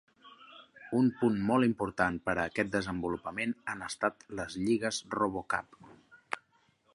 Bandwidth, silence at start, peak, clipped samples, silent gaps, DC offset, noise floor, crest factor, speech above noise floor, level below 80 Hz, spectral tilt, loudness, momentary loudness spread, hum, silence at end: 11.5 kHz; 0.25 s; -12 dBFS; under 0.1%; none; under 0.1%; -70 dBFS; 22 dB; 38 dB; -60 dBFS; -5.5 dB/octave; -32 LUFS; 13 LU; none; 0.55 s